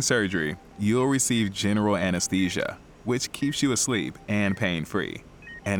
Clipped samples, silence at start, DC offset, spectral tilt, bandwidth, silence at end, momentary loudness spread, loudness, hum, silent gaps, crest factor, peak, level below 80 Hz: under 0.1%; 0 s; under 0.1%; -4 dB/octave; 20 kHz; 0 s; 10 LU; -26 LUFS; none; none; 16 dB; -10 dBFS; -54 dBFS